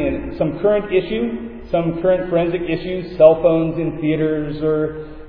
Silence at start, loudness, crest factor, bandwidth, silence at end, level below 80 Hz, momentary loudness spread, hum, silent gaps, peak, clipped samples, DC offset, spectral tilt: 0 s; -18 LUFS; 18 dB; 5.2 kHz; 0 s; -38 dBFS; 10 LU; none; none; 0 dBFS; under 0.1%; under 0.1%; -10.5 dB/octave